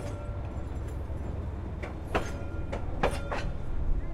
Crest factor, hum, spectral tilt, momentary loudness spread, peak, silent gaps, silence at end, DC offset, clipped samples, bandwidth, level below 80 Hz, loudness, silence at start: 18 dB; none; -6.5 dB/octave; 6 LU; -14 dBFS; none; 0 s; under 0.1%; under 0.1%; 12 kHz; -36 dBFS; -35 LUFS; 0 s